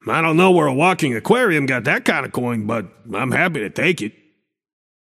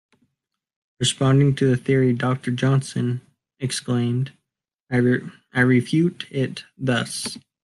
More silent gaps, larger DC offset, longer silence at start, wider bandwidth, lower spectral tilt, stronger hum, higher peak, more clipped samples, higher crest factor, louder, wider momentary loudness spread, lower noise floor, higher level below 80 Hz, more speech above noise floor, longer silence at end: second, none vs 4.82-4.87 s; neither; second, 0.05 s vs 1 s; first, 15.5 kHz vs 12.5 kHz; about the same, -5.5 dB/octave vs -5.5 dB/octave; neither; first, 0 dBFS vs -4 dBFS; neither; about the same, 18 dB vs 18 dB; first, -18 LUFS vs -22 LUFS; about the same, 11 LU vs 10 LU; second, -64 dBFS vs -82 dBFS; about the same, -62 dBFS vs -58 dBFS; second, 47 dB vs 61 dB; first, 1 s vs 0.25 s